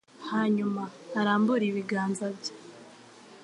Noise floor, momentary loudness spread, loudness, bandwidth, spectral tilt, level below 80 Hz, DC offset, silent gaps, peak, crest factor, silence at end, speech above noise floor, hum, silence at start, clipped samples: -51 dBFS; 17 LU; -29 LUFS; 11 kHz; -6 dB/octave; -80 dBFS; under 0.1%; none; -12 dBFS; 18 dB; 0 s; 23 dB; none; 0.2 s; under 0.1%